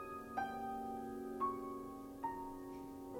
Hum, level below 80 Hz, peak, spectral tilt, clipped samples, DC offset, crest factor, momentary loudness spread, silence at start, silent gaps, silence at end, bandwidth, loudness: none; -66 dBFS; -28 dBFS; -6 dB/octave; under 0.1%; under 0.1%; 16 dB; 9 LU; 0 s; none; 0 s; 19.5 kHz; -45 LUFS